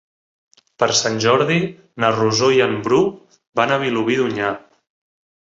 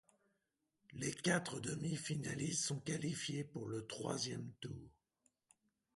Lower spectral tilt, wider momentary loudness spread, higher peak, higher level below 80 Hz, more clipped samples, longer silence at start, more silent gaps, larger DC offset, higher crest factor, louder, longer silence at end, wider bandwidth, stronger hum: about the same, -4 dB/octave vs -4 dB/octave; second, 8 LU vs 12 LU; first, 0 dBFS vs -22 dBFS; first, -58 dBFS vs -74 dBFS; neither; about the same, 0.8 s vs 0.9 s; first, 3.47-3.53 s vs none; neither; about the same, 18 dB vs 22 dB; first, -18 LUFS vs -42 LUFS; second, 0.8 s vs 1.05 s; second, 7.8 kHz vs 11.5 kHz; neither